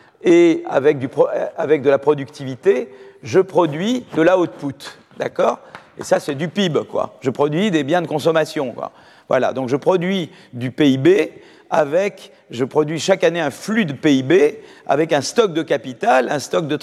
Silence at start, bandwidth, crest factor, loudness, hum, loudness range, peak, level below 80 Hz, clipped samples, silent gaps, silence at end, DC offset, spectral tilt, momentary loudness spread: 0.25 s; 13.5 kHz; 16 dB; -18 LUFS; none; 3 LU; -2 dBFS; -66 dBFS; under 0.1%; none; 0.05 s; under 0.1%; -5.5 dB/octave; 13 LU